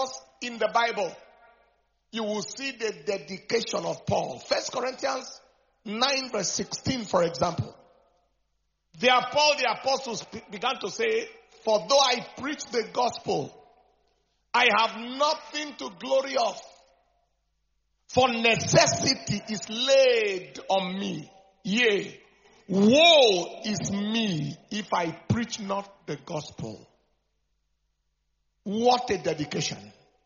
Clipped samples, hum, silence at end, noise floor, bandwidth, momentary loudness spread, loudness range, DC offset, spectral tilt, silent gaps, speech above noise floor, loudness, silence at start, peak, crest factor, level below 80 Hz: under 0.1%; none; 0.35 s; -75 dBFS; 7.2 kHz; 15 LU; 8 LU; under 0.1%; -2.5 dB/octave; none; 49 dB; -25 LUFS; 0 s; -4 dBFS; 24 dB; -62 dBFS